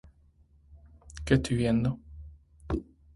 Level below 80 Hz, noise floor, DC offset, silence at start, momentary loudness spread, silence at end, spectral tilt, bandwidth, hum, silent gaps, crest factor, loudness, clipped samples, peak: -44 dBFS; -61 dBFS; under 0.1%; 0.7 s; 23 LU; 0.35 s; -7 dB/octave; 11.5 kHz; none; none; 22 dB; -29 LUFS; under 0.1%; -10 dBFS